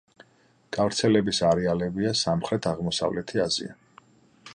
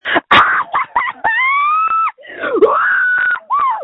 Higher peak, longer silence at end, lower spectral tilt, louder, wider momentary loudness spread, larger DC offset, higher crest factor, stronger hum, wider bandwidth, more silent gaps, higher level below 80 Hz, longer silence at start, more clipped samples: second, -8 dBFS vs 0 dBFS; about the same, 0.05 s vs 0 s; about the same, -4.5 dB/octave vs -4.5 dB/octave; second, -25 LUFS vs -13 LUFS; about the same, 6 LU vs 8 LU; neither; about the same, 18 dB vs 14 dB; neither; first, 11 kHz vs 8.6 kHz; neither; about the same, -54 dBFS vs -52 dBFS; first, 0.7 s vs 0.05 s; neither